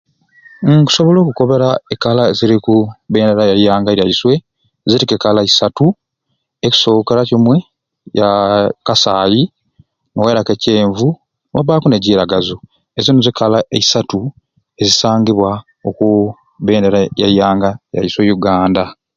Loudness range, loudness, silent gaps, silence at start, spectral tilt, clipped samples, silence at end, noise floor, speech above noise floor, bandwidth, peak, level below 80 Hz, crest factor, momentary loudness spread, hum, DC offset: 2 LU; -12 LUFS; none; 0.6 s; -5.5 dB/octave; under 0.1%; 0.25 s; -70 dBFS; 58 dB; 7.6 kHz; 0 dBFS; -44 dBFS; 12 dB; 9 LU; none; under 0.1%